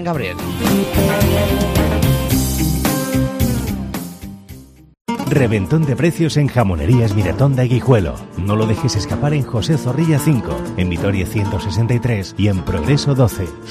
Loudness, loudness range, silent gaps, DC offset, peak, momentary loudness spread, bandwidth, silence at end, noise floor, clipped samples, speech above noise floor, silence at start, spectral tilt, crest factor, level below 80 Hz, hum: -17 LUFS; 3 LU; 5.01-5.05 s; under 0.1%; -2 dBFS; 9 LU; 15.5 kHz; 0 s; -38 dBFS; under 0.1%; 22 dB; 0 s; -6 dB/octave; 14 dB; -30 dBFS; none